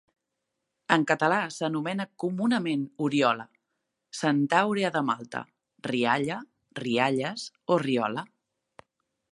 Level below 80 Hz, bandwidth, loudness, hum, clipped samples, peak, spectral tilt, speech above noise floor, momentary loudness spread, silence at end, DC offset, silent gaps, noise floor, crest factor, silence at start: -76 dBFS; 11.5 kHz; -27 LUFS; none; under 0.1%; -4 dBFS; -5.5 dB/octave; 56 dB; 14 LU; 1.05 s; under 0.1%; none; -83 dBFS; 26 dB; 0.9 s